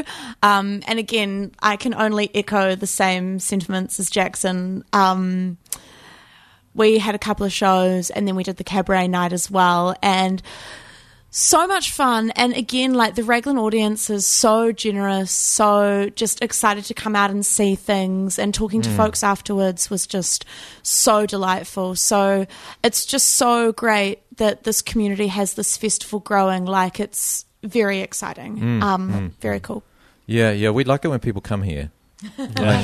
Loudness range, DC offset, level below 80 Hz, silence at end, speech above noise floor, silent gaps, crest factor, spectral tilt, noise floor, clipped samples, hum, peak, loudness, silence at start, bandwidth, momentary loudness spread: 4 LU; under 0.1%; -46 dBFS; 0 s; 32 dB; none; 18 dB; -3.5 dB/octave; -51 dBFS; under 0.1%; none; -2 dBFS; -19 LUFS; 0 s; 13.5 kHz; 10 LU